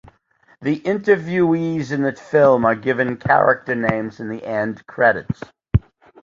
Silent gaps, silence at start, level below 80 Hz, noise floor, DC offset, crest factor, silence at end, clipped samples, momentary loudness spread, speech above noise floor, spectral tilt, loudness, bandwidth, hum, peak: none; 0.6 s; -38 dBFS; -57 dBFS; under 0.1%; 18 dB; 0.45 s; under 0.1%; 11 LU; 38 dB; -8 dB/octave; -19 LUFS; 7.6 kHz; none; -2 dBFS